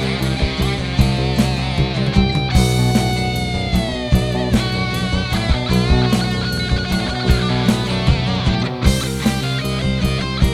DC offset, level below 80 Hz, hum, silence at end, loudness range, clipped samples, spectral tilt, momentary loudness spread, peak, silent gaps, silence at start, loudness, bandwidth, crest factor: under 0.1%; -24 dBFS; none; 0 s; 1 LU; under 0.1%; -5.5 dB/octave; 4 LU; 0 dBFS; none; 0 s; -18 LUFS; 15 kHz; 16 dB